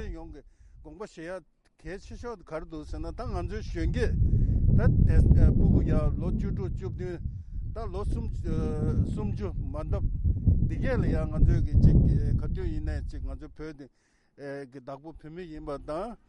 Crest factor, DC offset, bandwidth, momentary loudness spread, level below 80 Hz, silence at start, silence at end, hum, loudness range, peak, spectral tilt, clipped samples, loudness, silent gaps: 20 dB; under 0.1%; 9 kHz; 20 LU; -30 dBFS; 0 s; 0.1 s; none; 14 LU; -8 dBFS; -9.5 dB/octave; under 0.1%; -28 LUFS; none